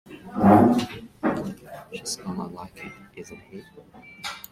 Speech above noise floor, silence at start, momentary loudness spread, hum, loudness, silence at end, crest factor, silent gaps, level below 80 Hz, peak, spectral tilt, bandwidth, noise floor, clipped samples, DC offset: 17 dB; 0.1 s; 25 LU; none; -23 LUFS; 0.1 s; 22 dB; none; -56 dBFS; -4 dBFS; -6 dB/octave; 16 kHz; -40 dBFS; under 0.1%; under 0.1%